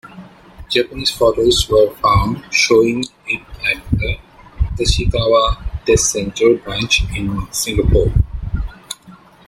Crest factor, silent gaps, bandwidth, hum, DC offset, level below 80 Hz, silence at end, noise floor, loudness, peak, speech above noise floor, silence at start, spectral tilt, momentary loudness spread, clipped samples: 16 dB; none; 16.5 kHz; none; under 0.1%; -26 dBFS; 0.3 s; -43 dBFS; -16 LUFS; 0 dBFS; 28 dB; 0.05 s; -4 dB/octave; 11 LU; under 0.1%